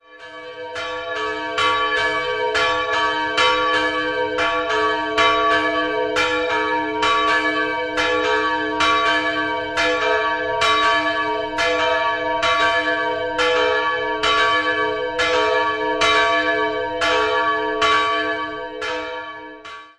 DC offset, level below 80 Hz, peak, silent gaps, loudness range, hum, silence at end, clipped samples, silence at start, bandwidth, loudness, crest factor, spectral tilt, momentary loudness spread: under 0.1%; -48 dBFS; -2 dBFS; none; 1 LU; none; 0.1 s; under 0.1%; 0.1 s; 12 kHz; -19 LUFS; 18 dB; -2.5 dB/octave; 9 LU